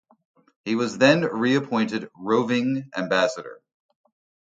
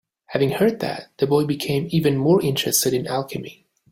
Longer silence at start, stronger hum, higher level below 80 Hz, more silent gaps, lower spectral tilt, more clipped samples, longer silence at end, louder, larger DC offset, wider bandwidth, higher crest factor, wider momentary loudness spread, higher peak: first, 0.65 s vs 0.3 s; neither; second, -68 dBFS vs -58 dBFS; neither; about the same, -5.5 dB/octave vs -5 dB/octave; neither; first, 0.95 s vs 0.4 s; about the same, -23 LUFS vs -21 LUFS; neither; second, 9 kHz vs 16.5 kHz; about the same, 20 dB vs 16 dB; about the same, 12 LU vs 11 LU; about the same, -4 dBFS vs -4 dBFS